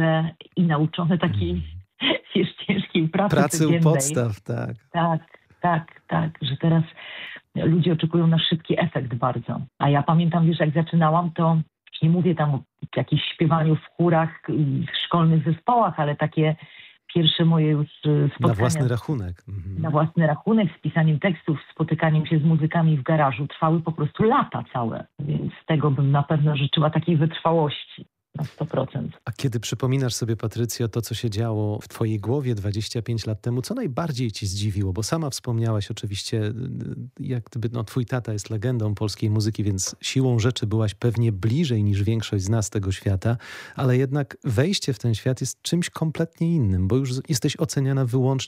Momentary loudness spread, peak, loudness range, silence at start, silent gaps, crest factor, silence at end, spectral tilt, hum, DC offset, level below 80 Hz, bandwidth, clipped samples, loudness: 9 LU; -6 dBFS; 5 LU; 0 s; none; 18 dB; 0 s; -6 dB/octave; none; under 0.1%; -54 dBFS; 14.5 kHz; under 0.1%; -23 LUFS